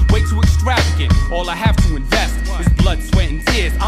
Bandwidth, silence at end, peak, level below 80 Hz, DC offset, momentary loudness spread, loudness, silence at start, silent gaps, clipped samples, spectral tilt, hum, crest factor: 14.5 kHz; 0 s; -2 dBFS; -16 dBFS; under 0.1%; 3 LU; -16 LUFS; 0 s; none; under 0.1%; -5.5 dB/octave; none; 12 dB